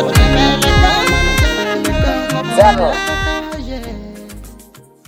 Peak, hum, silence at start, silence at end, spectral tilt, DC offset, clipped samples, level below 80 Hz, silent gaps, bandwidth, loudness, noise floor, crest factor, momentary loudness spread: 0 dBFS; none; 0 s; 0.45 s; -4.5 dB/octave; under 0.1%; under 0.1%; -20 dBFS; none; 17 kHz; -13 LUFS; -41 dBFS; 14 dB; 18 LU